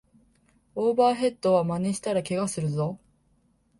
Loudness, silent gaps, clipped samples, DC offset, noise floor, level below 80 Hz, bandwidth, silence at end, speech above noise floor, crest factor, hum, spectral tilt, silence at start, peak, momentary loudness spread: -26 LUFS; none; under 0.1%; under 0.1%; -66 dBFS; -62 dBFS; 11.5 kHz; 0.85 s; 41 dB; 16 dB; none; -6 dB/octave; 0.75 s; -10 dBFS; 9 LU